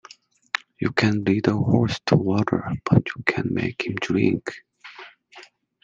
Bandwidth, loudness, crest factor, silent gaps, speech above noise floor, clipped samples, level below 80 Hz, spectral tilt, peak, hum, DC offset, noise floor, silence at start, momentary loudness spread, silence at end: 7.8 kHz; -23 LUFS; 22 dB; none; 28 dB; under 0.1%; -52 dBFS; -7 dB/octave; -2 dBFS; none; under 0.1%; -50 dBFS; 0.55 s; 21 LU; 0.4 s